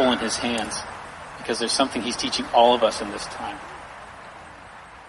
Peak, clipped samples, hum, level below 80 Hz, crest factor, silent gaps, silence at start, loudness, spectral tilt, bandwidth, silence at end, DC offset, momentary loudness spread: -4 dBFS; under 0.1%; none; -54 dBFS; 22 dB; none; 0 s; -23 LUFS; -2.5 dB/octave; 11.5 kHz; 0 s; under 0.1%; 23 LU